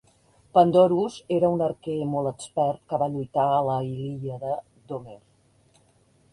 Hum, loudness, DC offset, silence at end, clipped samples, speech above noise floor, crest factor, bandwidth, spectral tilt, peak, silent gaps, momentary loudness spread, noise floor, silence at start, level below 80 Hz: none; -24 LUFS; under 0.1%; 1.15 s; under 0.1%; 38 dB; 20 dB; 11 kHz; -7.5 dB/octave; -6 dBFS; none; 14 LU; -62 dBFS; 0.55 s; -62 dBFS